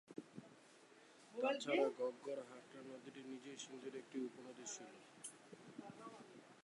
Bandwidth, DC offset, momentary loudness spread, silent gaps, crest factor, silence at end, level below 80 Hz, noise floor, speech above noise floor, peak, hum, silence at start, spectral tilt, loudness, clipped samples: 11.5 kHz; under 0.1%; 22 LU; none; 22 dB; 0.05 s; under -90 dBFS; -66 dBFS; 20 dB; -26 dBFS; none; 0.1 s; -3.5 dB/octave; -47 LUFS; under 0.1%